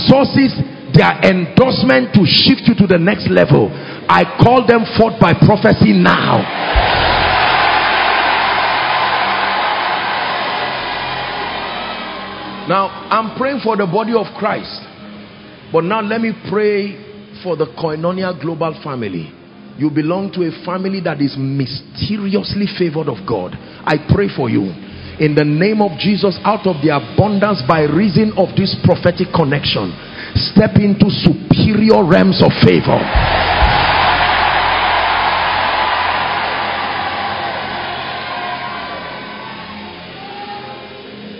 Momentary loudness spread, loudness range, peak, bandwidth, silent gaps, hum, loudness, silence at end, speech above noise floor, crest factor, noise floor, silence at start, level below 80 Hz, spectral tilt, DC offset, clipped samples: 14 LU; 9 LU; 0 dBFS; 7 kHz; none; none; -14 LUFS; 0 s; 23 dB; 14 dB; -36 dBFS; 0 s; -32 dBFS; -8 dB/octave; under 0.1%; 0.3%